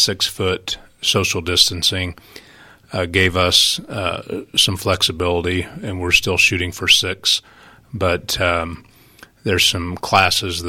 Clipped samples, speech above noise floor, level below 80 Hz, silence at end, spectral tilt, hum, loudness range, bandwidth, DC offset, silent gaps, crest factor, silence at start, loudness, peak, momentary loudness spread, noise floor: under 0.1%; 28 dB; -42 dBFS; 0 s; -2.5 dB/octave; none; 3 LU; 18 kHz; under 0.1%; none; 20 dB; 0 s; -16 LUFS; 0 dBFS; 12 LU; -47 dBFS